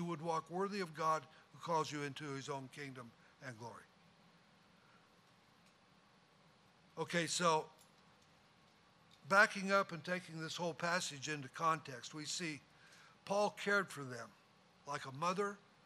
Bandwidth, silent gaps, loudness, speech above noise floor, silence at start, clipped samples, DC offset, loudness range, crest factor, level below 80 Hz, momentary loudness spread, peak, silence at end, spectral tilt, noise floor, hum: 15 kHz; none; -39 LUFS; 29 dB; 0 s; under 0.1%; under 0.1%; 15 LU; 26 dB; -86 dBFS; 19 LU; -16 dBFS; 0.3 s; -3.5 dB/octave; -69 dBFS; none